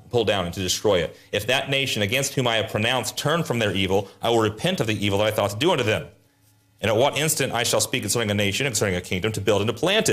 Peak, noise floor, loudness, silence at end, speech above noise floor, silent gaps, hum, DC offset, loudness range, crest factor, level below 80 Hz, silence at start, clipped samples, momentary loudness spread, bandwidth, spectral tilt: -8 dBFS; -60 dBFS; -22 LUFS; 0 s; 37 dB; none; none; under 0.1%; 1 LU; 14 dB; -56 dBFS; 0.05 s; under 0.1%; 4 LU; 15.5 kHz; -3.5 dB/octave